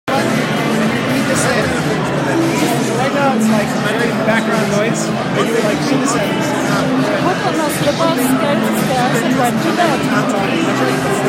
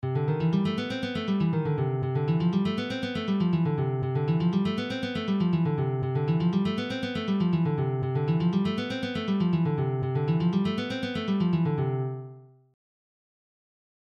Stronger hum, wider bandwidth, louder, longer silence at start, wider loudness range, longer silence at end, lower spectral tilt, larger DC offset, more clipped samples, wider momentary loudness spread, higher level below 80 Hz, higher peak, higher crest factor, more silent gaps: neither; first, 16.5 kHz vs 7 kHz; first, -15 LUFS vs -27 LUFS; about the same, 0.05 s vs 0.05 s; about the same, 1 LU vs 2 LU; second, 0 s vs 1.55 s; second, -5 dB/octave vs -8.5 dB/octave; neither; neither; second, 2 LU vs 5 LU; first, -50 dBFS vs -60 dBFS; first, -2 dBFS vs -14 dBFS; about the same, 12 dB vs 12 dB; neither